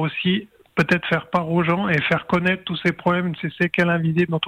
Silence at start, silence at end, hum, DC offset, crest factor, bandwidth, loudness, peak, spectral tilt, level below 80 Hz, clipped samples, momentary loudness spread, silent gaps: 0 s; 0 s; none; under 0.1%; 14 dB; 8.8 kHz; -21 LUFS; -8 dBFS; -7 dB/octave; -54 dBFS; under 0.1%; 4 LU; none